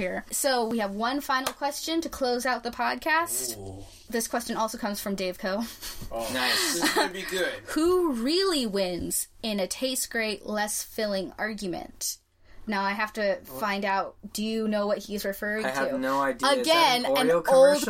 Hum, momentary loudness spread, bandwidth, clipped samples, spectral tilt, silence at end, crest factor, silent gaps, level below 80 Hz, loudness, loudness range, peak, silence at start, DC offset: none; 9 LU; 16.5 kHz; under 0.1%; -2.5 dB/octave; 0 s; 18 dB; none; -54 dBFS; -27 LUFS; 5 LU; -8 dBFS; 0 s; under 0.1%